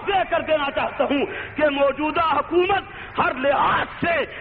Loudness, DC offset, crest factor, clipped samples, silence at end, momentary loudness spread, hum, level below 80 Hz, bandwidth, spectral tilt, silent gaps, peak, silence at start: -21 LUFS; under 0.1%; 14 dB; under 0.1%; 0 s; 4 LU; none; -48 dBFS; 4.8 kHz; -2.5 dB/octave; none; -8 dBFS; 0 s